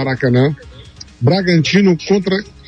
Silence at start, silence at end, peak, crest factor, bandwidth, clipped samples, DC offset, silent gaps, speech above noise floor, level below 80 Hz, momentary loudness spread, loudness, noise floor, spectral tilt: 0 s; 0.2 s; -2 dBFS; 12 dB; 8.4 kHz; under 0.1%; under 0.1%; none; 23 dB; -44 dBFS; 6 LU; -14 LUFS; -37 dBFS; -6.5 dB/octave